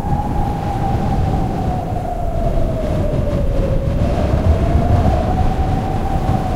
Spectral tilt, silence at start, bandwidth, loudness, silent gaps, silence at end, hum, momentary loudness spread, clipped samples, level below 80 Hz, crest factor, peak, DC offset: -8.5 dB/octave; 0 s; 14 kHz; -18 LUFS; none; 0 s; none; 5 LU; under 0.1%; -20 dBFS; 14 dB; -2 dBFS; under 0.1%